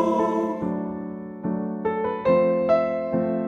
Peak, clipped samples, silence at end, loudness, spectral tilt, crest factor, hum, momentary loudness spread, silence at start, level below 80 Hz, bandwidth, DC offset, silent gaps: -10 dBFS; under 0.1%; 0 s; -24 LUFS; -8.5 dB/octave; 14 dB; none; 11 LU; 0 s; -58 dBFS; 7.2 kHz; under 0.1%; none